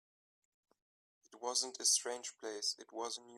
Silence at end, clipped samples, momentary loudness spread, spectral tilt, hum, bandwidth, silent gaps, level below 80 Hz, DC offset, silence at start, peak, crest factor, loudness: 0 s; under 0.1%; 13 LU; 2 dB/octave; none; 15.5 kHz; none; under -90 dBFS; under 0.1%; 1.3 s; -20 dBFS; 22 dB; -37 LUFS